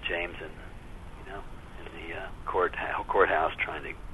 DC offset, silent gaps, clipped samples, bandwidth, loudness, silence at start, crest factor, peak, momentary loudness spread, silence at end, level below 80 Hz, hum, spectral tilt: under 0.1%; none; under 0.1%; 12 kHz; -29 LUFS; 0 s; 24 dB; -8 dBFS; 22 LU; 0 s; -46 dBFS; none; -5.5 dB/octave